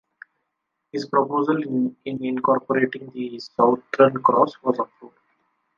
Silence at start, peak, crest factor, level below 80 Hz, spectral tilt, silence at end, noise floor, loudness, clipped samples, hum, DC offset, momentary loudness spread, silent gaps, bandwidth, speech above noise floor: 0.95 s; -2 dBFS; 20 dB; -70 dBFS; -7.5 dB/octave; 0.7 s; -78 dBFS; -22 LUFS; under 0.1%; none; under 0.1%; 14 LU; none; 7.4 kHz; 57 dB